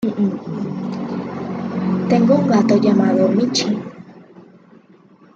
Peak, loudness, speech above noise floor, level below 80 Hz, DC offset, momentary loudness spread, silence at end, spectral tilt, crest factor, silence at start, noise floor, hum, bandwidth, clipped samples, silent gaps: -2 dBFS; -18 LUFS; 34 dB; -62 dBFS; under 0.1%; 12 LU; 0.95 s; -6.5 dB/octave; 16 dB; 0 s; -48 dBFS; none; 7.8 kHz; under 0.1%; none